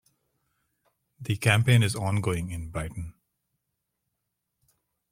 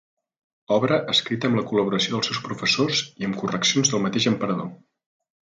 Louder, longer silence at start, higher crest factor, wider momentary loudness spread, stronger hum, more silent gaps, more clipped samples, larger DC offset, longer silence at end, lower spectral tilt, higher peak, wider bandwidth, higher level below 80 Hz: second, -26 LUFS vs -22 LUFS; first, 1.2 s vs 0.7 s; first, 24 dB vs 18 dB; first, 19 LU vs 7 LU; neither; neither; neither; neither; first, 2 s vs 0.8 s; first, -5.5 dB/octave vs -3.5 dB/octave; about the same, -4 dBFS vs -6 dBFS; first, 16 kHz vs 9.6 kHz; first, -52 dBFS vs -64 dBFS